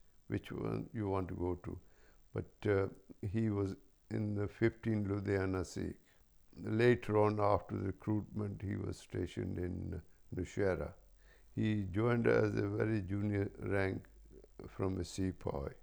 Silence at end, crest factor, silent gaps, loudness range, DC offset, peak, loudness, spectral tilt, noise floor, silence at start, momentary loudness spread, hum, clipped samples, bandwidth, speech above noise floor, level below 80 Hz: 0.05 s; 20 dB; none; 5 LU; under 0.1%; -16 dBFS; -37 LUFS; -7.5 dB/octave; -65 dBFS; 0.3 s; 14 LU; none; under 0.1%; over 20 kHz; 29 dB; -58 dBFS